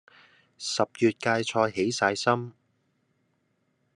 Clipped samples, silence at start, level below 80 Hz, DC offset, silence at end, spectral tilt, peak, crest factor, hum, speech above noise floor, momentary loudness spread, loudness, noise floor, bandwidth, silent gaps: under 0.1%; 0.6 s; -72 dBFS; under 0.1%; 1.45 s; -4 dB/octave; -8 dBFS; 22 dB; none; 47 dB; 7 LU; -26 LUFS; -73 dBFS; 11.5 kHz; none